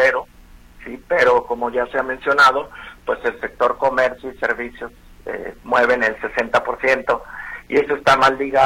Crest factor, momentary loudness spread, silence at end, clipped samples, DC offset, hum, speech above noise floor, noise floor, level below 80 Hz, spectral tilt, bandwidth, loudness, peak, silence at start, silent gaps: 18 dB; 17 LU; 0 s; under 0.1%; under 0.1%; none; 26 dB; -45 dBFS; -46 dBFS; -4 dB/octave; 16 kHz; -18 LUFS; 0 dBFS; 0 s; none